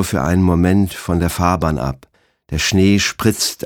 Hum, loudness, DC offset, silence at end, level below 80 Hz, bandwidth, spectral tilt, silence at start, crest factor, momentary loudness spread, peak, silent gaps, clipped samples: none; -16 LUFS; under 0.1%; 0.1 s; -32 dBFS; 18 kHz; -5 dB/octave; 0 s; 16 dB; 9 LU; 0 dBFS; none; under 0.1%